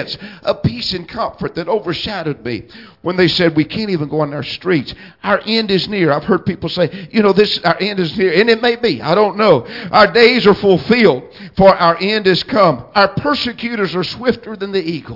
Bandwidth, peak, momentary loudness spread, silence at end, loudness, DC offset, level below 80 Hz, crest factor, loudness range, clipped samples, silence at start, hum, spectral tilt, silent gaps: 5.8 kHz; 0 dBFS; 11 LU; 0 s; -14 LUFS; under 0.1%; -46 dBFS; 14 dB; 6 LU; under 0.1%; 0 s; none; -6.5 dB/octave; none